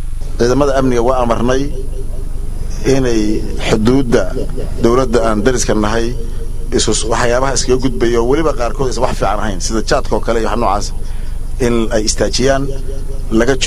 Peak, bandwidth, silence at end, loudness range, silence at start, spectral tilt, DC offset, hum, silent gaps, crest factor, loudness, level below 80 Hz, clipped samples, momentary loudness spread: 0 dBFS; 12.5 kHz; 0 s; 2 LU; 0 s; -4.5 dB/octave; under 0.1%; none; none; 12 dB; -15 LUFS; -20 dBFS; under 0.1%; 13 LU